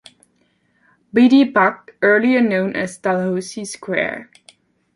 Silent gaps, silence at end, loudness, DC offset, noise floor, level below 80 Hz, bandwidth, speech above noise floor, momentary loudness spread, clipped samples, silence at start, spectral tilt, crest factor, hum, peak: none; 0.75 s; -17 LUFS; under 0.1%; -62 dBFS; -64 dBFS; 11.5 kHz; 46 dB; 12 LU; under 0.1%; 1.15 s; -5.5 dB/octave; 16 dB; none; -2 dBFS